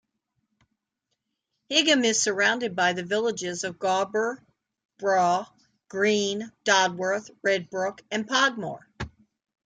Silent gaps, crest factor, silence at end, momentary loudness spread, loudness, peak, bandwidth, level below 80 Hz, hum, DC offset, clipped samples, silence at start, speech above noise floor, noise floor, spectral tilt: 4.85-4.89 s; 20 dB; 0.6 s; 15 LU; -24 LUFS; -8 dBFS; 10 kHz; -62 dBFS; none; under 0.1%; under 0.1%; 1.7 s; 56 dB; -81 dBFS; -2.5 dB/octave